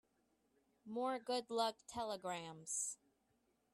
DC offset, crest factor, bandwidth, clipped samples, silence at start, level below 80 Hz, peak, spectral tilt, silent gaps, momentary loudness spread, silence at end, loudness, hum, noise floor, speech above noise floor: under 0.1%; 20 dB; 14.5 kHz; under 0.1%; 0.85 s; -82 dBFS; -26 dBFS; -2 dB/octave; none; 7 LU; 0.8 s; -43 LUFS; none; -81 dBFS; 38 dB